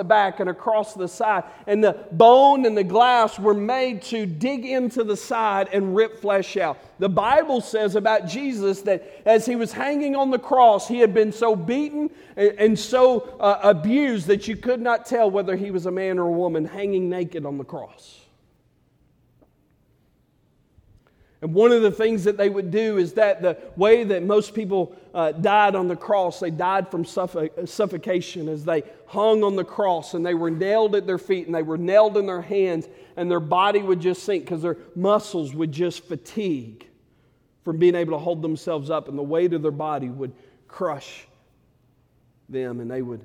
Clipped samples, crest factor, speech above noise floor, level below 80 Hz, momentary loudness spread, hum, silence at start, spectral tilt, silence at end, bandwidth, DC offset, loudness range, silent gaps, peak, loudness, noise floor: under 0.1%; 22 dB; 42 dB; -62 dBFS; 11 LU; none; 0 s; -6 dB/octave; 0.05 s; 14.5 kHz; under 0.1%; 9 LU; none; 0 dBFS; -21 LUFS; -63 dBFS